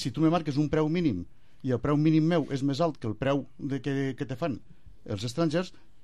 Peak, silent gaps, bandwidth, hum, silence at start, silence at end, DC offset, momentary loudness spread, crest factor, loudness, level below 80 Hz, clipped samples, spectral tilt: -12 dBFS; none; 11.5 kHz; none; 0 s; 0.35 s; 0.5%; 12 LU; 16 dB; -28 LUFS; -54 dBFS; under 0.1%; -7.5 dB/octave